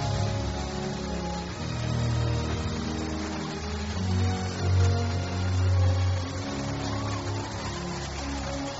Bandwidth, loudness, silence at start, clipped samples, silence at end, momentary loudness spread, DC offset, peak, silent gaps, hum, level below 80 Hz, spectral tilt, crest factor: 8 kHz; -29 LUFS; 0 s; under 0.1%; 0 s; 8 LU; under 0.1%; -14 dBFS; none; none; -40 dBFS; -6 dB/octave; 14 dB